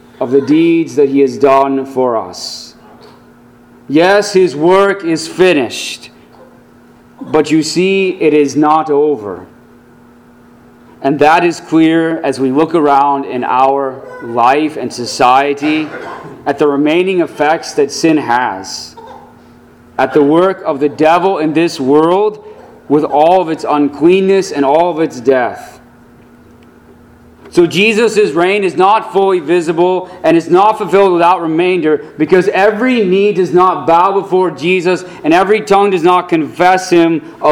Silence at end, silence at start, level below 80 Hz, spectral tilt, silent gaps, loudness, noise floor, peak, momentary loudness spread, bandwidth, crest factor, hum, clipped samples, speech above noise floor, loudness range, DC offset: 0 s; 0.2 s; -52 dBFS; -5.5 dB/octave; none; -11 LUFS; -41 dBFS; 0 dBFS; 9 LU; 14.5 kHz; 12 dB; none; 0.3%; 31 dB; 4 LU; under 0.1%